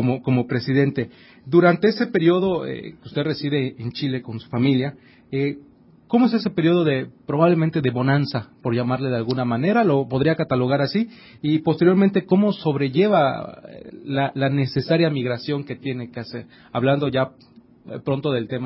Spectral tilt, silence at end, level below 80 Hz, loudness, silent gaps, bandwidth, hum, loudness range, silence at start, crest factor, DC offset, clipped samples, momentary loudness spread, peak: -11.5 dB/octave; 0 s; -58 dBFS; -21 LUFS; none; 5.8 kHz; none; 4 LU; 0 s; 16 dB; under 0.1%; under 0.1%; 12 LU; -4 dBFS